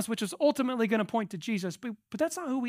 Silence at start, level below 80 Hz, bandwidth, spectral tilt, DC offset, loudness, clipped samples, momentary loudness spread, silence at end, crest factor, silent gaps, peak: 0 s; -78 dBFS; 16 kHz; -5 dB/octave; under 0.1%; -31 LUFS; under 0.1%; 9 LU; 0 s; 16 dB; none; -14 dBFS